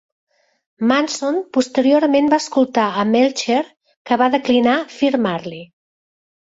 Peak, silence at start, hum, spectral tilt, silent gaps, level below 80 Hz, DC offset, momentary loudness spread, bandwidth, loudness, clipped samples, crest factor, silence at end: -2 dBFS; 0.8 s; none; -4.5 dB/octave; 3.96-4.05 s; -62 dBFS; under 0.1%; 7 LU; 8 kHz; -17 LUFS; under 0.1%; 16 dB; 0.85 s